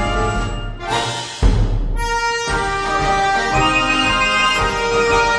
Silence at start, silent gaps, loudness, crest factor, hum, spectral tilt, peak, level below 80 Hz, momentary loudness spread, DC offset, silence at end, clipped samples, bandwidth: 0 s; none; -17 LUFS; 16 dB; none; -4 dB/octave; -2 dBFS; -24 dBFS; 8 LU; under 0.1%; 0 s; under 0.1%; 11 kHz